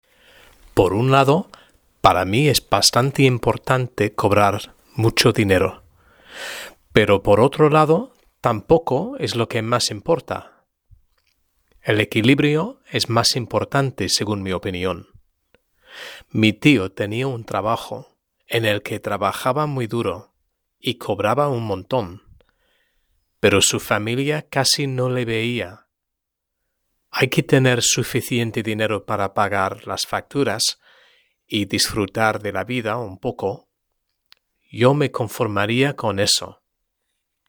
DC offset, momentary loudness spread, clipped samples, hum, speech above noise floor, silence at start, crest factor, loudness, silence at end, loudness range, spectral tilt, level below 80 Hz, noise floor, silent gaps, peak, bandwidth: under 0.1%; 12 LU; under 0.1%; none; 61 dB; 0.75 s; 20 dB; -19 LUFS; 0.95 s; 6 LU; -4.5 dB/octave; -50 dBFS; -81 dBFS; none; 0 dBFS; over 20 kHz